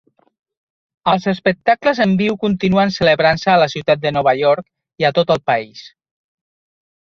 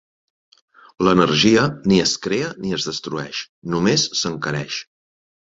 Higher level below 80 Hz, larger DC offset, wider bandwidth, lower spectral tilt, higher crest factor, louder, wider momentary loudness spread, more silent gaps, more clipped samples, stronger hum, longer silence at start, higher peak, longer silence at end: about the same, -52 dBFS vs -52 dBFS; neither; about the same, 7.2 kHz vs 7.8 kHz; first, -6.5 dB/octave vs -4 dB/octave; about the same, 16 dB vs 20 dB; first, -16 LUFS vs -19 LUFS; second, 6 LU vs 12 LU; second, none vs 3.49-3.62 s; neither; neither; about the same, 1.05 s vs 1 s; about the same, 0 dBFS vs -2 dBFS; first, 1.25 s vs 0.65 s